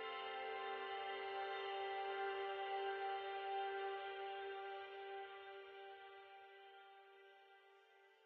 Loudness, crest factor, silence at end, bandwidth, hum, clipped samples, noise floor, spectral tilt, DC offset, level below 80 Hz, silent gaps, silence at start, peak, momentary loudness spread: -47 LUFS; 14 dB; 0 s; 5.8 kHz; none; under 0.1%; -69 dBFS; 2 dB/octave; under 0.1%; under -90 dBFS; none; 0 s; -34 dBFS; 18 LU